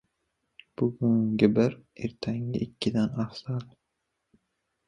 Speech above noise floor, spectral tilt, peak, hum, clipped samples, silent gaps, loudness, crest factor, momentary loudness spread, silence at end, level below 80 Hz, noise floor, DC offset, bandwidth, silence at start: 54 dB; -8 dB/octave; -8 dBFS; none; under 0.1%; none; -28 LUFS; 22 dB; 13 LU; 1.25 s; -60 dBFS; -81 dBFS; under 0.1%; 10 kHz; 0.8 s